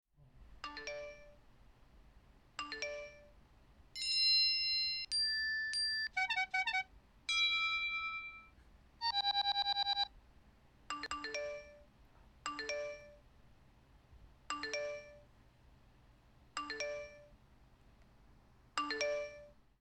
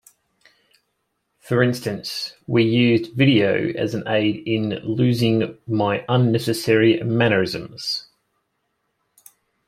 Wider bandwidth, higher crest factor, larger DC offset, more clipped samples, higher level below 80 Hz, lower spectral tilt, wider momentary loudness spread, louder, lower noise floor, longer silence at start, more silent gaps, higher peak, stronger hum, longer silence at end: second, 14 kHz vs 16 kHz; about the same, 20 dB vs 20 dB; neither; neither; second, -66 dBFS vs -60 dBFS; second, -0.5 dB/octave vs -6.5 dB/octave; first, 18 LU vs 10 LU; second, -36 LUFS vs -20 LUFS; second, -65 dBFS vs -73 dBFS; second, 0.2 s vs 1.45 s; neither; second, -22 dBFS vs -2 dBFS; neither; second, 0.25 s vs 1.65 s